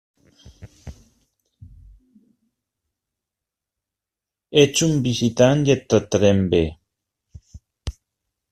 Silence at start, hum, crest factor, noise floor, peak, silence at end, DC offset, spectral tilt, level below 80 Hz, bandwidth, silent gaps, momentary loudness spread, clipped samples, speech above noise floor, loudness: 0.6 s; none; 20 dB; -87 dBFS; -2 dBFS; 0.6 s; under 0.1%; -5 dB/octave; -46 dBFS; 14.5 kHz; none; 20 LU; under 0.1%; 70 dB; -18 LUFS